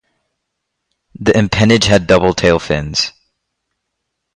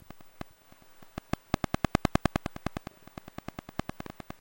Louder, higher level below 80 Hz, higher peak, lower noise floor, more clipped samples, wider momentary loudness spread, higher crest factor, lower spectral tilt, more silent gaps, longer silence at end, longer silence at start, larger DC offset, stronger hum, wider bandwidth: first, -13 LUFS vs -35 LUFS; first, -36 dBFS vs -46 dBFS; first, 0 dBFS vs -6 dBFS; first, -74 dBFS vs -56 dBFS; neither; second, 7 LU vs 19 LU; second, 16 dB vs 30 dB; about the same, -5 dB/octave vs -6 dB/octave; neither; first, 1.25 s vs 0.35 s; first, 1.2 s vs 0.1 s; neither; neither; second, 11 kHz vs 16.5 kHz